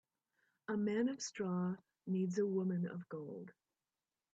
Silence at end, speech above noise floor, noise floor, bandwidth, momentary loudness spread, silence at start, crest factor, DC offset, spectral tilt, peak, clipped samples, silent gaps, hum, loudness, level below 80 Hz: 0.8 s; over 51 dB; under -90 dBFS; 8 kHz; 13 LU; 0.7 s; 14 dB; under 0.1%; -6.5 dB/octave; -26 dBFS; under 0.1%; none; none; -40 LUFS; -86 dBFS